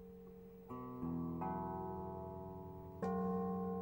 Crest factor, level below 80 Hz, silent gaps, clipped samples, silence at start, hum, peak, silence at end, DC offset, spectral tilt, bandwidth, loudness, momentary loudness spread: 16 dB; -64 dBFS; none; under 0.1%; 0 s; none; -28 dBFS; 0 s; under 0.1%; -10.5 dB/octave; 16.5 kHz; -44 LUFS; 15 LU